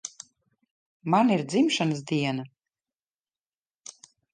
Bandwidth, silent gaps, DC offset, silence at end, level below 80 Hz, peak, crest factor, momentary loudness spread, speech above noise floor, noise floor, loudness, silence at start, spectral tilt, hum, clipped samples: 9.8 kHz; 0.71-1.00 s; under 0.1%; 1.85 s; -76 dBFS; -10 dBFS; 20 dB; 23 LU; over 66 dB; under -90 dBFS; -25 LUFS; 0.05 s; -5 dB/octave; none; under 0.1%